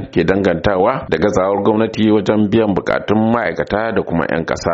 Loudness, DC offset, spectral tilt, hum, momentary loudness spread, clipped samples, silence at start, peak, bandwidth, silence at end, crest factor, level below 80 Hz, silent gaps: -15 LUFS; under 0.1%; -5.5 dB/octave; none; 4 LU; under 0.1%; 0 s; 0 dBFS; 7.8 kHz; 0 s; 14 dB; -40 dBFS; none